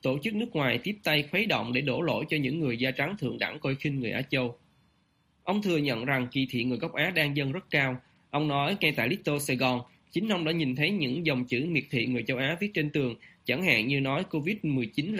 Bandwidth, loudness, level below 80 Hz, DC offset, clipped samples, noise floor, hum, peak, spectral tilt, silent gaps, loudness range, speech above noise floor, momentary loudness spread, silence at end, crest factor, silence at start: 15.5 kHz; -28 LUFS; -64 dBFS; under 0.1%; under 0.1%; -69 dBFS; none; -10 dBFS; -5.5 dB/octave; none; 3 LU; 40 dB; 6 LU; 0 s; 20 dB; 0.05 s